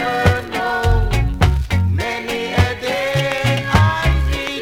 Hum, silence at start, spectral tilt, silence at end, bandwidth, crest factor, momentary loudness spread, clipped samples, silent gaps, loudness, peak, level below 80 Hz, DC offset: none; 0 s; -5.5 dB/octave; 0 s; 16 kHz; 16 dB; 5 LU; under 0.1%; none; -18 LUFS; 0 dBFS; -22 dBFS; under 0.1%